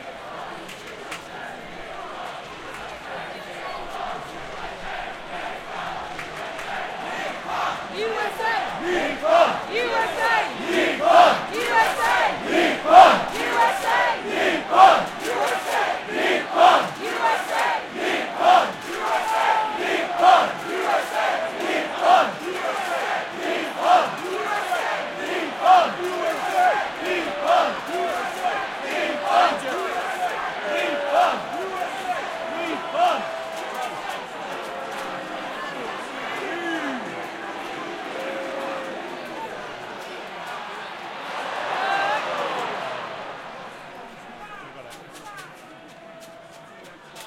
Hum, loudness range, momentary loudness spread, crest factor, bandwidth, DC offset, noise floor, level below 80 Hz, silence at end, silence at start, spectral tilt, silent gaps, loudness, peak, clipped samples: none; 15 LU; 17 LU; 22 dB; 16.5 kHz; under 0.1%; -44 dBFS; -58 dBFS; 0 s; 0 s; -3 dB/octave; none; -22 LUFS; 0 dBFS; under 0.1%